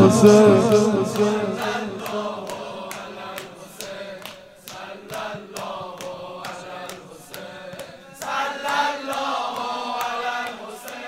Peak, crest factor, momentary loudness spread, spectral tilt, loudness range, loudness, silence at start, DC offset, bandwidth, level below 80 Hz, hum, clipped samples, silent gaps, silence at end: 0 dBFS; 22 dB; 20 LU; -5.5 dB/octave; 13 LU; -21 LUFS; 0 s; under 0.1%; 16 kHz; -60 dBFS; none; under 0.1%; none; 0 s